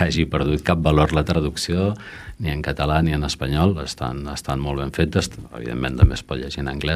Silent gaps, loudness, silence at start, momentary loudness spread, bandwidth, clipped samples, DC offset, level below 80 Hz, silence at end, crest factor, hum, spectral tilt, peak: none; -22 LUFS; 0 s; 10 LU; 14.5 kHz; under 0.1%; under 0.1%; -30 dBFS; 0 s; 18 dB; none; -6 dB/octave; -2 dBFS